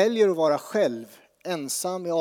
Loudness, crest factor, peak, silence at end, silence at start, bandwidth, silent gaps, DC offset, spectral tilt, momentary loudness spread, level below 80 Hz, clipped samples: -25 LUFS; 16 dB; -8 dBFS; 0 s; 0 s; over 20 kHz; none; under 0.1%; -4 dB/octave; 13 LU; -84 dBFS; under 0.1%